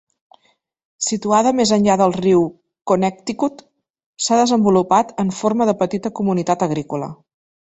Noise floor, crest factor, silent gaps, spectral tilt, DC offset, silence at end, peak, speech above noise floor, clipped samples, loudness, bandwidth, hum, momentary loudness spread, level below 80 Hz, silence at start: -63 dBFS; 16 dB; 4.06-4.13 s; -5 dB/octave; under 0.1%; 0.6 s; -2 dBFS; 46 dB; under 0.1%; -18 LUFS; 8.2 kHz; none; 9 LU; -58 dBFS; 1 s